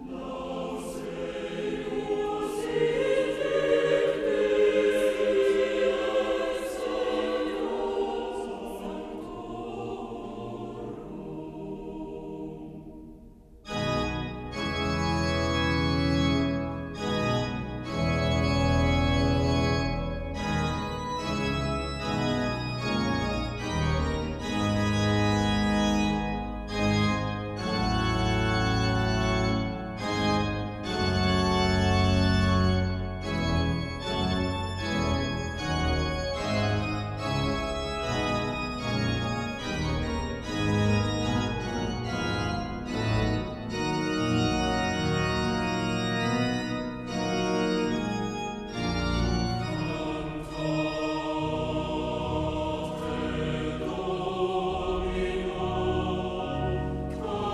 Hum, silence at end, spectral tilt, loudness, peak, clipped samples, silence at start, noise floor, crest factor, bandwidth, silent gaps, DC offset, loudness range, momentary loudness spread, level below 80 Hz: none; 0 s; -6 dB/octave; -28 LUFS; -12 dBFS; under 0.1%; 0 s; -50 dBFS; 16 dB; 13.5 kHz; none; under 0.1%; 6 LU; 10 LU; -40 dBFS